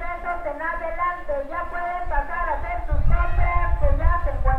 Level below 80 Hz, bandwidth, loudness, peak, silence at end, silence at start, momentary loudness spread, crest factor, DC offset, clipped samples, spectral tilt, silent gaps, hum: -24 dBFS; 4 kHz; -25 LUFS; -4 dBFS; 0 s; 0 s; 5 LU; 16 dB; under 0.1%; under 0.1%; -8.5 dB/octave; none; none